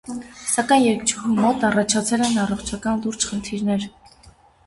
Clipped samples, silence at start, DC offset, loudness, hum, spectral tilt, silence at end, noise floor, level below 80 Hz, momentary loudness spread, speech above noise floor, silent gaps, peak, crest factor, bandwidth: under 0.1%; 0.05 s; under 0.1%; -21 LUFS; none; -3.5 dB/octave; 0.35 s; -51 dBFS; -50 dBFS; 9 LU; 30 dB; none; -4 dBFS; 18 dB; 11.5 kHz